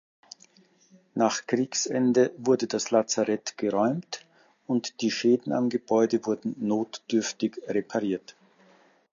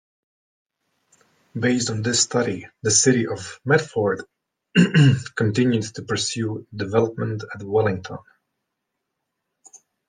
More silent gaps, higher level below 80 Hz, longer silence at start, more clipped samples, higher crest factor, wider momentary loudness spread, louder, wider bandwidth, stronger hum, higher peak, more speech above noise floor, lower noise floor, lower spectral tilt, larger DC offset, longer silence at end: neither; second, -74 dBFS vs -64 dBFS; second, 1.15 s vs 1.55 s; neither; about the same, 20 dB vs 20 dB; second, 7 LU vs 14 LU; second, -27 LUFS vs -21 LUFS; second, 7.6 kHz vs 10.5 kHz; neither; second, -8 dBFS vs -4 dBFS; second, 34 dB vs 59 dB; second, -60 dBFS vs -79 dBFS; about the same, -4.5 dB/octave vs -4.5 dB/octave; neither; second, 0.8 s vs 1.9 s